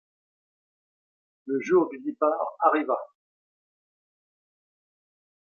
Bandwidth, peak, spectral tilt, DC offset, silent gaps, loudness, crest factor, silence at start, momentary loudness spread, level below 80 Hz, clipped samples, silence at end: 6.8 kHz; -6 dBFS; -6.5 dB/octave; under 0.1%; none; -26 LUFS; 24 dB; 1.45 s; 8 LU; -80 dBFS; under 0.1%; 2.5 s